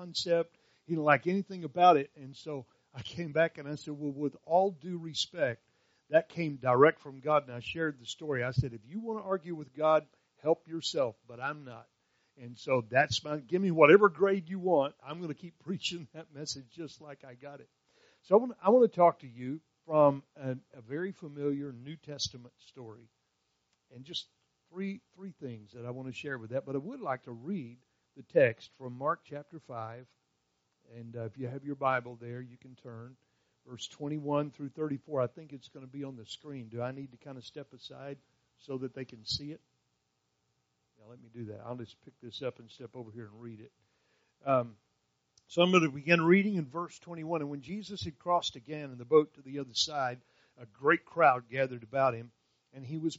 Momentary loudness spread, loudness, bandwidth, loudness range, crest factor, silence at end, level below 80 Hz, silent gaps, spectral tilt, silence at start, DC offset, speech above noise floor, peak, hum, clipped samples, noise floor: 22 LU; -31 LUFS; 7.6 kHz; 15 LU; 26 dB; 0 s; -68 dBFS; none; -4 dB/octave; 0 s; under 0.1%; 47 dB; -8 dBFS; none; under 0.1%; -79 dBFS